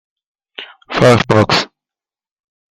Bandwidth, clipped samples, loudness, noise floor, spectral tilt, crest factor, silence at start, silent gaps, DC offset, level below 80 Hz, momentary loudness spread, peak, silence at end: 13.5 kHz; under 0.1%; -12 LUFS; -89 dBFS; -5.5 dB/octave; 16 dB; 0.6 s; none; under 0.1%; -46 dBFS; 21 LU; 0 dBFS; 1.1 s